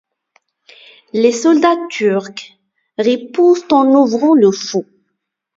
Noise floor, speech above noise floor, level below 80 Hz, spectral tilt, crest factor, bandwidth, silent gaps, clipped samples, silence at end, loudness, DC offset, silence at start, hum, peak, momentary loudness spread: -73 dBFS; 61 dB; -64 dBFS; -5 dB/octave; 14 dB; 7.8 kHz; none; under 0.1%; 0.75 s; -13 LUFS; under 0.1%; 1.15 s; none; 0 dBFS; 12 LU